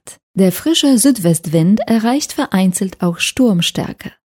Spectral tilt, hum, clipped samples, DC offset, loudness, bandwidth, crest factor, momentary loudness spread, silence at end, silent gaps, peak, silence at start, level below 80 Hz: -4.5 dB/octave; none; under 0.1%; under 0.1%; -14 LUFS; 18 kHz; 14 dB; 8 LU; 0.25 s; 0.23-0.34 s; 0 dBFS; 0.05 s; -50 dBFS